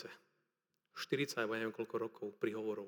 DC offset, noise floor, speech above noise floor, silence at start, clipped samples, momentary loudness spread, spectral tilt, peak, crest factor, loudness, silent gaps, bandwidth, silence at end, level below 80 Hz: under 0.1%; -87 dBFS; 47 dB; 0 s; under 0.1%; 16 LU; -4.5 dB/octave; -22 dBFS; 20 dB; -40 LUFS; none; over 20 kHz; 0 s; under -90 dBFS